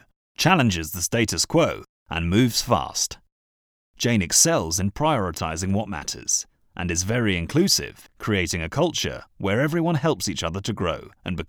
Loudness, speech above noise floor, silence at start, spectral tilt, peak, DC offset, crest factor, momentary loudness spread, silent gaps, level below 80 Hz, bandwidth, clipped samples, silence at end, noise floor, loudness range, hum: -23 LUFS; over 67 dB; 0.4 s; -3.5 dB/octave; -4 dBFS; under 0.1%; 20 dB; 11 LU; 1.89-2.06 s, 3.32-3.94 s; -44 dBFS; over 20 kHz; under 0.1%; 0.05 s; under -90 dBFS; 2 LU; none